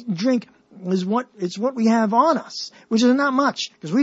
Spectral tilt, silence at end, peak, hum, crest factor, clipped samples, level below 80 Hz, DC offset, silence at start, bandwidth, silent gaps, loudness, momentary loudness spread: -5.5 dB/octave; 0 s; -4 dBFS; none; 16 dB; under 0.1%; -74 dBFS; under 0.1%; 0 s; 8 kHz; none; -20 LUFS; 12 LU